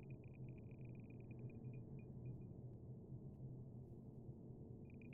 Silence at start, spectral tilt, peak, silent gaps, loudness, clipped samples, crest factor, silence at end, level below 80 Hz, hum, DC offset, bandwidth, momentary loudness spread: 0 s; -10 dB/octave; -42 dBFS; none; -56 LUFS; under 0.1%; 12 dB; 0 s; -68 dBFS; none; under 0.1%; 2.9 kHz; 3 LU